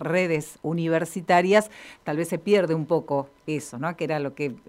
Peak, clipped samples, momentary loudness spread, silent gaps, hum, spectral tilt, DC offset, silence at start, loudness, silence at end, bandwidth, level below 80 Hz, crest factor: -6 dBFS; under 0.1%; 10 LU; none; none; -6 dB/octave; under 0.1%; 0 s; -25 LUFS; 0.1 s; 16 kHz; -66 dBFS; 18 dB